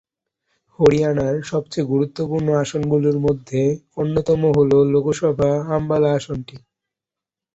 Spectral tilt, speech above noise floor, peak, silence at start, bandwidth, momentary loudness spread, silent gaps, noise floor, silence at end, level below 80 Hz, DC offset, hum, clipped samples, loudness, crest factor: -7.5 dB/octave; 69 dB; -2 dBFS; 0.8 s; 8 kHz; 8 LU; none; -88 dBFS; 1 s; -48 dBFS; under 0.1%; none; under 0.1%; -19 LUFS; 18 dB